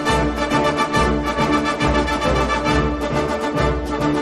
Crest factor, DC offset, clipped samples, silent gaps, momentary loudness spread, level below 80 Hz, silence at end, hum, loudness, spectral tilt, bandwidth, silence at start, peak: 14 dB; under 0.1%; under 0.1%; none; 3 LU; -28 dBFS; 0 s; none; -19 LUFS; -5.5 dB/octave; 13 kHz; 0 s; -4 dBFS